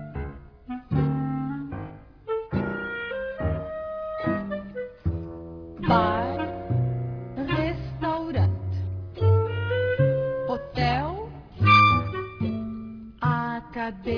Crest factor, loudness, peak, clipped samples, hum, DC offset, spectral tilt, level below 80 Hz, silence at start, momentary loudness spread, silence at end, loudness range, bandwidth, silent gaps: 20 dB; -26 LUFS; -6 dBFS; under 0.1%; none; under 0.1%; -8.5 dB/octave; -44 dBFS; 0 s; 14 LU; 0 s; 8 LU; 5.4 kHz; none